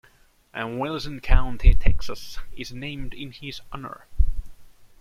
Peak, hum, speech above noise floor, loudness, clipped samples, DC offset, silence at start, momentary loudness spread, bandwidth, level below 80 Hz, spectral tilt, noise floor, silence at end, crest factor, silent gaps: -2 dBFS; none; 37 dB; -29 LUFS; under 0.1%; under 0.1%; 0.55 s; 15 LU; 7 kHz; -24 dBFS; -6 dB/octave; -57 dBFS; 0.35 s; 18 dB; none